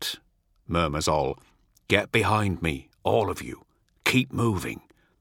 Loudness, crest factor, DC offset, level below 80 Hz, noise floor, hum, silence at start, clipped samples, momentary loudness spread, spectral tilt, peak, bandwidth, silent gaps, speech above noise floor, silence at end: -26 LUFS; 24 dB; under 0.1%; -46 dBFS; -64 dBFS; none; 0 s; under 0.1%; 16 LU; -5 dB/octave; -2 dBFS; 17.5 kHz; none; 39 dB; 0.4 s